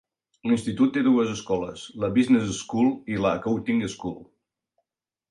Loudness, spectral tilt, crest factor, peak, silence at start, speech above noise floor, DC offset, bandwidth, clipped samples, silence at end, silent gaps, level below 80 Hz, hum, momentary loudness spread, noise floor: -24 LUFS; -6 dB/octave; 16 dB; -10 dBFS; 0.45 s; 62 dB; under 0.1%; 11 kHz; under 0.1%; 1.05 s; none; -56 dBFS; none; 13 LU; -86 dBFS